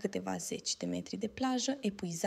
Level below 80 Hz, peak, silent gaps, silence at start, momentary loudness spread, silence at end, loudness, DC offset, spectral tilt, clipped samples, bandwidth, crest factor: -68 dBFS; -18 dBFS; none; 0 s; 5 LU; 0 s; -36 LUFS; under 0.1%; -4 dB/octave; under 0.1%; 15 kHz; 18 dB